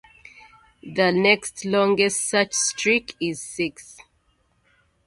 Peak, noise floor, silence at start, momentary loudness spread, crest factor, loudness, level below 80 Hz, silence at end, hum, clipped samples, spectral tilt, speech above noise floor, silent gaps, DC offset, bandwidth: -2 dBFS; -66 dBFS; 0.85 s; 10 LU; 22 dB; -21 LUFS; -62 dBFS; 1.15 s; none; under 0.1%; -3 dB/octave; 43 dB; none; under 0.1%; 12 kHz